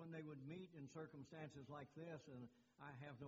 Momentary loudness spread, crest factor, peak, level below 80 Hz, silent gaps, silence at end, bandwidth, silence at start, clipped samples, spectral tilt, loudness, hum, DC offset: 5 LU; 16 dB; -42 dBFS; -86 dBFS; none; 0 s; 7.4 kHz; 0 s; under 0.1%; -6.5 dB/octave; -58 LUFS; none; under 0.1%